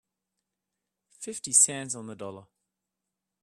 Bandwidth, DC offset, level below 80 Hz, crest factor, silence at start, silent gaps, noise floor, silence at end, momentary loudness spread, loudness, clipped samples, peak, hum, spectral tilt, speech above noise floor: 15 kHz; under 0.1%; -78 dBFS; 26 dB; 1.2 s; none; -86 dBFS; 1 s; 21 LU; -23 LUFS; under 0.1%; -6 dBFS; none; -1.5 dB/octave; 58 dB